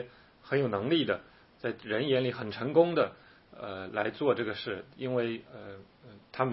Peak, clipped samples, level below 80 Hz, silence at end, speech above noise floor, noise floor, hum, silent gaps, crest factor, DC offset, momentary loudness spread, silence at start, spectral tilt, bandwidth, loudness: -10 dBFS; under 0.1%; -70 dBFS; 0 s; 20 dB; -51 dBFS; none; none; 22 dB; under 0.1%; 18 LU; 0 s; -10 dB/octave; 5.8 kHz; -31 LUFS